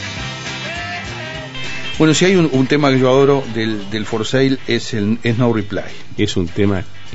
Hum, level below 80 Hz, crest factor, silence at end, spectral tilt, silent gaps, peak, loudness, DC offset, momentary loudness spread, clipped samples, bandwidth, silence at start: none; -44 dBFS; 16 dB; 0 s; -5.5 dB/octave; none; 0 dBFS; -17 LUFS; 4%; 13 LU; under 0.1%; 8 kHz; 0 s